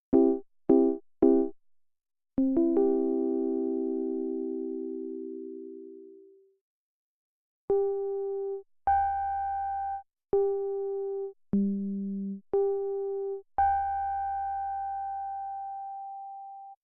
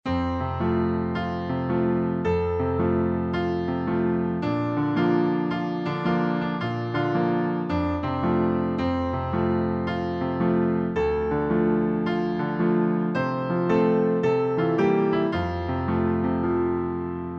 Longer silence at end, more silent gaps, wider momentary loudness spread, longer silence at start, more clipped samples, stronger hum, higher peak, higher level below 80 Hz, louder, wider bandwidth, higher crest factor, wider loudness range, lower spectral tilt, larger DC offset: about the same, 0.1 s vs 0 s; first, 6.61-7.68 s vs none; first, 15 LU vs 5 LU; about the same, 0.1 s vs 0.05 s; neither; neither; about the same, -10 dBFS vs -10 dBFS; second, -60 dBFS vs -46 dBFS; second, -30 LUFS vs -24 LUFS; second, 2.5 kHz vs 6.4 kHz; first, 20 dB vs 14 dB; first, 9 LU vs 2 LU; about the same, -10 dB/octave vs -9 dB/octave; neither